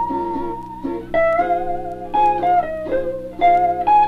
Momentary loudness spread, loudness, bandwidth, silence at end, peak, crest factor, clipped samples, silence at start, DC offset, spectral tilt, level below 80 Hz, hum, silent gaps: 12 LU; -19 LUFS; 6 kHz; 0 s; -6 dBFS; 12 dB; under 0.1%; 0 s; under 0.1%; -7 dB/octave; -40 dBFS; none; none